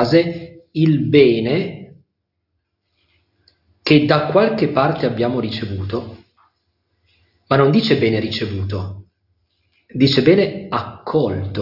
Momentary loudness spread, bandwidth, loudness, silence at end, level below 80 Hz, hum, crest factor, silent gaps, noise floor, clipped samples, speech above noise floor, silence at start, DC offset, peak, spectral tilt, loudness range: 14 LU; 5.8 kHz; -17 LUFS; 0 s; -54 dBFS; none; 18 dB; none; -74 dBFS; under 0.1%; 58 dB; 0 s; under 0.1%; 0 dBFS; -8 dB/octave; 2 LU